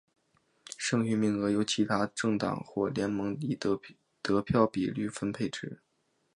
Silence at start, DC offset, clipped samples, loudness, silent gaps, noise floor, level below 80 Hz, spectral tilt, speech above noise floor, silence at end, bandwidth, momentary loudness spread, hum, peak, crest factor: 0.7 s; under 0.1%; under 0.1%; -31 LUFS; none; -72 dBFS; -60 dBFS; -5.5 dB/octave; 42 dB; 0.6 s; 11 kHz; 8 LU; none; -10 dBFS; 20 dB